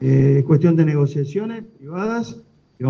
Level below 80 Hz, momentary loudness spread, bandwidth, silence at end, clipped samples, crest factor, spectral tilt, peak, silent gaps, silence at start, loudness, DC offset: -54 dBFS; 17 LU; 6.6 kHz; 0 s; under 0.1%; 14 dB; -9.5 dB/octave; -4 dBFS; none; 0 s; -18 LUFS; under 0.1%